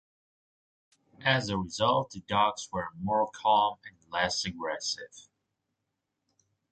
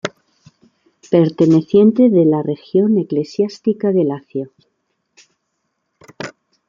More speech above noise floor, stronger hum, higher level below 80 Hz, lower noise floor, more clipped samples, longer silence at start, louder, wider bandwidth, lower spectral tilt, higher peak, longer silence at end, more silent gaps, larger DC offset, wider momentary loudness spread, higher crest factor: about the same, 54 dB vs 57 dB; neither; about the same, -60 dBFS vs -62 dBFS; first, -84 dBFS vs -72 dBFS; neither; first, 1.2 s vs 0.05 s; second, -29 LUFS vs -15 LUFS; first, 9.2 kHz vs 7.4 kHz; second, -3.5 dB/octave vs -8.5 dB/octave; second, -10 dBFS vs 0 dBFS; first, 1.5 s vs 0.4 s; neither; neither; second, 10 LU vs 20 LU; first, 22 dB vs 16 dB